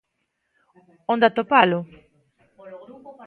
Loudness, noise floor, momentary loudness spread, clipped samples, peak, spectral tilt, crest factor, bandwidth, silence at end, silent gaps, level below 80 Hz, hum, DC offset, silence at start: -19 LUFS; -75 dBFS; 25 LU; under 0.1%; 0 dBFS; -8 dB/octave; 24 dB; 4.7 kHz; 0.15 s; none; -68 dBFS; none; under 0.1%; 1.1 s